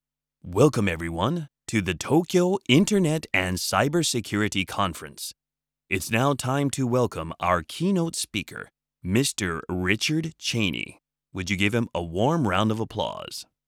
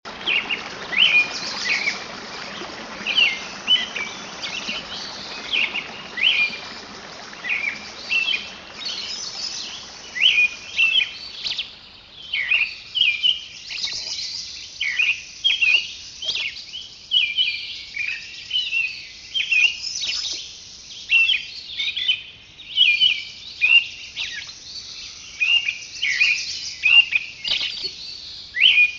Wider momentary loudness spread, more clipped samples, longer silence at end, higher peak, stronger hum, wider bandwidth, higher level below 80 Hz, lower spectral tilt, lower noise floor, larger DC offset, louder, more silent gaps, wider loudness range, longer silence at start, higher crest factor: second, 11 LU vs 18 LU; neither; first, 0.25 s vs 0 s; about the same, -6 dBFS vs -4 dBFS; neither; first, 19 kHz vs 7.8 kHz; about the same, -56 dBFS vs -58 dBFS; first, -4.5 dB/octave vs 1 dB/octave; first, -90 dBFS vs -43 dBFS; neither; second, -25 LUFS vs -20 LUFS; neither; about the same, 3 LU vs 4 LU; first, 0.45 s vs 0.05 s; about the same, 20 dB vs 20 dB